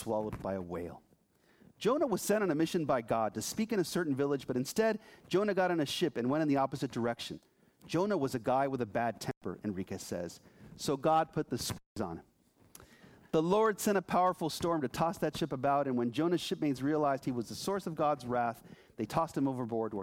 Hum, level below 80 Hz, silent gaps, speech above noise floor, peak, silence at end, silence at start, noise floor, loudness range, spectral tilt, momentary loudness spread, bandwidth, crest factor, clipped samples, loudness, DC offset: none; -64 dBFS; 9.37-9.41 s, 11.86-11.96 s; 36 dB; -16 dBFS; 0 s; 0 s; -68 dBFS; 3 LU; -5.5 dB/octave; 10 LU; 17 kHz; 18 dB; under 0.1%; -33 LUFS; under 0.1%